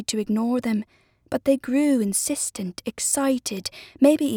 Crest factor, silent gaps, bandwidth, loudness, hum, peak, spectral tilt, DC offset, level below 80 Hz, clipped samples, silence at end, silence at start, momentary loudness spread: 18 dB; none; 20 kHz; -23 LUFS; none; -4 dBFS; -4 dB/octave; under 0.1%; -60 dBFS; under 0.1%; 0 s; 0 s; 11 LU